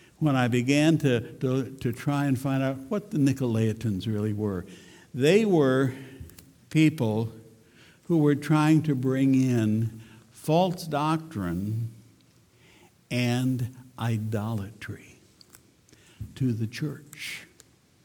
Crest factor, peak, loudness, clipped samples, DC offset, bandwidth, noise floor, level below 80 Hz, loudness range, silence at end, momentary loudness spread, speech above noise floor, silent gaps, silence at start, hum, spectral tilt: 18 dB; -8 dBFS; -26 LUFS; under 0.1%; under 0.1%; 19 kHz; -59 dBFS; -60 dBFS; 8 LU; 0.6 s; 16 LU; 34 dB; none; 0.2 s; none; -7 dB/octave